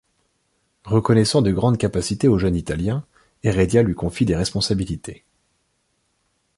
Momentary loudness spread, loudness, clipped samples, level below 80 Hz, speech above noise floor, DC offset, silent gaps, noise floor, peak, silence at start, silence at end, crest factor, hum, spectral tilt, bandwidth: 9 LU; -20 LUFS; under 0.1%; -38 dBFS; 50 dB; under 0.1%; none; -69 dBFS; -4 dBFS; 0.85 s; 1.45 s; 18 dB; none; -6 dB/octave; 11.5 kHz